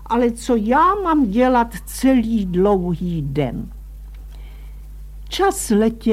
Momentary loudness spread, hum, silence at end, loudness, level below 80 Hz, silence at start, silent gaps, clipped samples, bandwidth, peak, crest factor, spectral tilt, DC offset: 23 LU; none; 0 s; -18 LUFS; -34 dBFS; 0 s; none; under 0.1%; 15.5 kHz; -4 dBFS; 16 dB; -6 dB/octave; under 0.1%